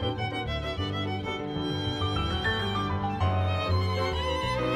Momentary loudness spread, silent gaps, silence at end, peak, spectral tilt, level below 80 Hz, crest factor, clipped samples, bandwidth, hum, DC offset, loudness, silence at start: 4 LU; none; 0 s; -14 dBFS; -6 dB/octave; -42 dBFS; 14 dB; under 0.1%; 10 kHz; none; under 0.1%; -29 LUFS; 0 s